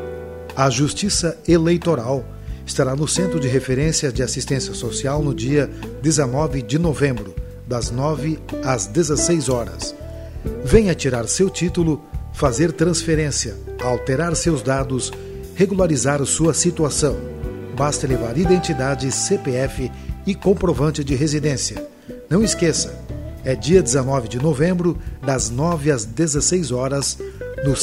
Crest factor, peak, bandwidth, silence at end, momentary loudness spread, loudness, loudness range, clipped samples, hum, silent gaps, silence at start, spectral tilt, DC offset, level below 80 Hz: 20 dB; 0 dBFS; 16 kHz; 0 s; 11 LU; -20 LUFS; 2 LU; under 0.1%; none; none; 0 s; -5 dB/octave; under 0.1%; -34 dBFS